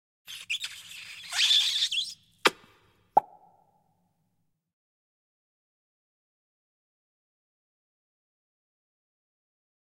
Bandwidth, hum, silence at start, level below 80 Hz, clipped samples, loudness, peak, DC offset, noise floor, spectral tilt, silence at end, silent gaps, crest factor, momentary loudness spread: 16 kHz; none; 0.3 s; -80 dBFS; under 0.1%; -26 LUFS; -2 dBFS; under 0.1%; -77 dBFS; 0.5 dB/octave; 6.65 s; none; 32 dB; 21 LU